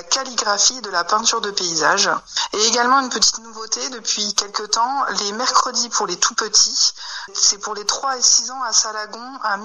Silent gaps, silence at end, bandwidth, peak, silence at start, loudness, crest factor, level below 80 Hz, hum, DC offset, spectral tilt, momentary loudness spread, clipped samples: none; 0 s; 12 kHz; -2 dBFS; 0 s; -17 LUFS; 18 dB; -58 dBFS; none; under 0.1%; 0.5 dB/octave; 9 LU; under 0.1%